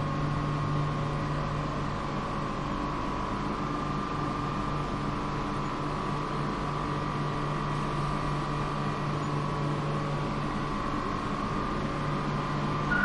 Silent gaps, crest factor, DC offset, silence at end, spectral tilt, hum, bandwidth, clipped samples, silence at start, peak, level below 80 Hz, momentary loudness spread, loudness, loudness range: none; 16 dB; under 0.1%; 0 s; -6.5 dB/octave; none; 11 kHz; under 0.1%; 0 s; -14 dBFS; -42 dBFS; 2 LU; -31 LUFS; 1 LU